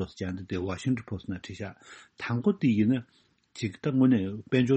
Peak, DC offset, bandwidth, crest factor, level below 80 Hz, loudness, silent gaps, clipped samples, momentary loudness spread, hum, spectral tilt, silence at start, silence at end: -12 dBFS; under 0.1%; 8.4 kHz; 18 dB; -60 dBFS; -29 LUFS; none; under 0.1%; 16 LU; none; -7.5 dB/octave; 0 s; 0 s